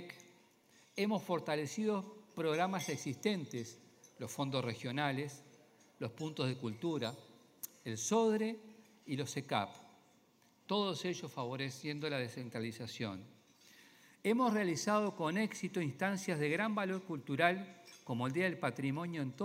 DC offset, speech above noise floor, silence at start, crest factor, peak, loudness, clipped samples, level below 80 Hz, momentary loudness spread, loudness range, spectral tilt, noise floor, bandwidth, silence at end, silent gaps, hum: under 0.1%; 32 dB; 0 s; 24 dB; -14 dBFS; -38 LUFS; under 0.1%; -84 dBFS; 14 LU; 5 LU; -5 dB/octave; -69 dBFS; 16 kHz; 0 s; none; none